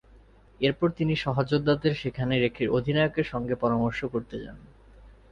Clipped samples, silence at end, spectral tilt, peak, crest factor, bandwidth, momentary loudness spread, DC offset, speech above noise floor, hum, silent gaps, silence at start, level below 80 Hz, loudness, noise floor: under 0.1%; 0.2 s; -8 dB/octave; -10 dBFS; 18 dB; 7.4 kHz; 8 LU; under 0.1%; 28 dB; none; none; 0.6 s; -50 dBFS; -27 LUFS; -54 dBFS